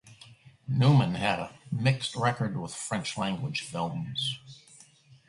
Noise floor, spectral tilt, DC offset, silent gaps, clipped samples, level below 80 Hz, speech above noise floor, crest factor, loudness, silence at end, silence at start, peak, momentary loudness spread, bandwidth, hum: -57 dBFS; -5.5 dB/octave; under 0.1%; none; under 0.1%; -60 dBFS; 29 dB; 20 dB; -29 LUFS; 0.7 s; 0.05 s; -10 dBFS; 11 LU; 11.5 kHz; none